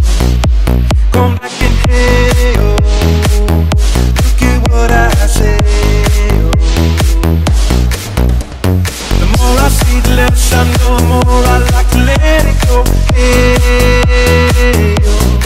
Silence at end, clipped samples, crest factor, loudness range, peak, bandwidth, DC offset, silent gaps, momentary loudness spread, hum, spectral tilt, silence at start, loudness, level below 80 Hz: 0 s; under 0.1%; 8 dB; 2 LU; 0 dBFS; 16 kHz; under 0.1%; none; 4 LU; none; -5.5 dB/octave; 0 s; -10 LUFS; -10 dBFS